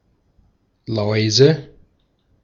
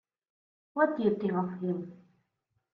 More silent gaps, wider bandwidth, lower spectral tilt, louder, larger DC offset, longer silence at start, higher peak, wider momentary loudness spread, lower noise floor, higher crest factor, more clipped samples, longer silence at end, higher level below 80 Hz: neither; first, 7.6 kHz vs 5 kHz; second, -5 dB/octave vs -10 dB/octave; first, -17 LUFS vs -31 LUFS; neither; first, 0.9 s vs 0.75 s; first, -2 dBFS vs -14 dBFS; about the same, 13 LU vs 12 LU; second, -62 dBFS vs -80 dBFS; about the same, 20 dB vs 20 dB; neither; about the same, 0.8 s vs 0.8 s; first, -56 dBFS vs -76 dBFS